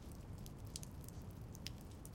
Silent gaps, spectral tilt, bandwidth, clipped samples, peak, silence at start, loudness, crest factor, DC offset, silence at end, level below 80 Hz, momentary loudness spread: none; -4.5 dB/octave; 17 kHz; under 0.1%; -28 dBFS; 0 s; -52 LUFS; 24 dB; under 0.1%; 0 s; -58 dBFS; 3 LU